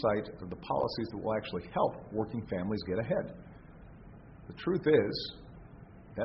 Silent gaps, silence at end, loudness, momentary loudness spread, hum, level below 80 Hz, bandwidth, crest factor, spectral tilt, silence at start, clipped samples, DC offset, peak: none; 0 s; -33 LUFS; 25 LU; none; -56 dBFS; 5.8 kHz; 20 dB; -5 dB/octave; 0 s; under 0.1%; under 0.1%; -14 dBFS